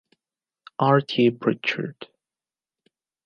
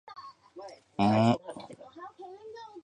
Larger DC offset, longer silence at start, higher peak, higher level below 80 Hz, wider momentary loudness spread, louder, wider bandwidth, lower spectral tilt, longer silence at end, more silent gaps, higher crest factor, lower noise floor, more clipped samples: neither; first, 0.8 s vs 0.1 s; first, -4 dBFS vs -10 dBFS; second, -74 dBFS vs -66 dBFS; about the same, 22 LU vs 23 LU; first, -22 LUFS vs -27 LUFS; second, 7 kHz vs 9.8 kHz; about the same, -7.5 dB/octave vs -7.5 dB/octave; first, 1.2 s vs 0.05 s; neither; about the same, 20 dB vs 22 dB; first, under -90 dBFS vs -48 dBFS; neither